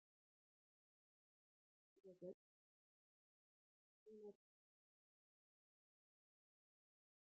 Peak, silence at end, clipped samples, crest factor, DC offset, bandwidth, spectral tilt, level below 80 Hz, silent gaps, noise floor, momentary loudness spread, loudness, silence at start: -44 dBFS; 2.95 s; under 0.1%; 24 dB; under 0.1%; 0.9 kHz; 4 dB/octave; under -90 dBFS; 2.34-4.06 s; under -90 dBFS; 8 LU; -62 LUFS; 1.95 s